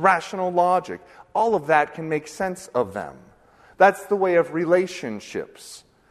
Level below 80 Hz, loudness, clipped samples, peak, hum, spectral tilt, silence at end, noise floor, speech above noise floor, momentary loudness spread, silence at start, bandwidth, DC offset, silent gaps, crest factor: -62 dBFS; -22 LUFS; under 0.1%; -2 dBFS; none; -5.5 dB/octave; 0.35 s; -53 dBFS; 31 dB; 18 LU; 0 s; 13.5 kHz; under 0.1%; none; 20 dB